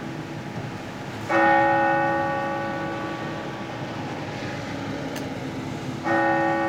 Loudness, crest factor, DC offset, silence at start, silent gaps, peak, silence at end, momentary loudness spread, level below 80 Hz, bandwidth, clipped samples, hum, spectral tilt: -25 LUFS; 16 dB; under 0.1%; 0 s; none; -8 dBFS; 0 s; 14 LU; -56 dBFS; 16.5 kHz; under 0.1%; none; -6 dB/octave